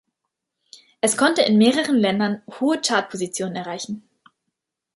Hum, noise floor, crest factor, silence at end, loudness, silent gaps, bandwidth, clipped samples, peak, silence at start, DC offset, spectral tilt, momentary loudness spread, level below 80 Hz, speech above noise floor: none; -80 dBFS; 18 dB; 0.95 s; -20 LUFS; none; 11.5 kHz; under 0.1%; -4 dBFS; 1.05 s; under 0.1%; -4 dB/octave; 13 LU; -68 dBFS; 60 dB